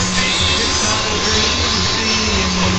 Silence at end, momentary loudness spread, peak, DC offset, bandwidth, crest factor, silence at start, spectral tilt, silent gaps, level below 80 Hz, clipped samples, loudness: 0 s; 1 LU; -4 dBFS; 0.9%; 9 kHz; 12 dB; 0 s; -2.5 dB/octave; none; -28 dBFS; under 0.1%; -14 LUFS